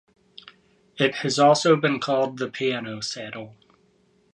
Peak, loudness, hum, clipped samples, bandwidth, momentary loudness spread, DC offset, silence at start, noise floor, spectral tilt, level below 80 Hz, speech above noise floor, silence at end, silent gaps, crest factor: -4 dBFS; -22 LUFS; none; under 0.1%; 11.5 kHz; 16 LU; under 0.1%; 0.95 s; -62 dBFS; -4.5 dB/octave; -70 dBFS; 40 dB; 0.8 s; none; 20 dB